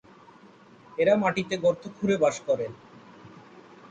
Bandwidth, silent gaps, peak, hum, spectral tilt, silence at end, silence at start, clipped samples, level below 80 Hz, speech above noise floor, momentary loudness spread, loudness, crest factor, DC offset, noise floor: 9.2 kHz; none; -10 dBFS; none; -5.5 dB/octave; 0.3 s; 1 s; under 0.1%; -66 dBFS; 28 dB; 14 LU; -26 LUFS; 18 dB; under 0.1%; -53 dBFS